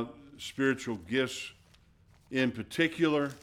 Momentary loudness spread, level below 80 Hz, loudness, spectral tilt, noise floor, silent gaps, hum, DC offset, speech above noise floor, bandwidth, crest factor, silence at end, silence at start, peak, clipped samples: 14 LU; -66 dBFS; -31 LUFS; -5 dB/octave; -62 dBFS; none; none; under 0.1%; 31 dB; 16 kHz; 18 dB; 0 s; 0 s; -14 dBFS; under 0.1%